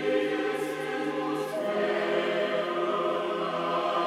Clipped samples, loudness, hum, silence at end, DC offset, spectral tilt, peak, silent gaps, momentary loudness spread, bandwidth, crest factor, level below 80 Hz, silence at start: under 0.1%; -29 LUFS; none; 0 s; under 0.1%; -5 dB/octave; -14 dBFS; none; 4 LU; 15 kHz; 14 dB; -76 dBFS; 0 s